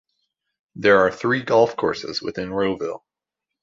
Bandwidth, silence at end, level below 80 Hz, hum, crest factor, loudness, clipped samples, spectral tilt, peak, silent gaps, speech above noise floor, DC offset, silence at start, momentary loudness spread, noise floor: 7.6 kHz; 0.65 s; -56 dBFS; none; 18 dB; -21 LUFS; under 0.1%; -5.5 dB/octave; -4 dBFS; none; 65 dB; under 0.1%; 0.75 s; 12 LU; -85 dBFS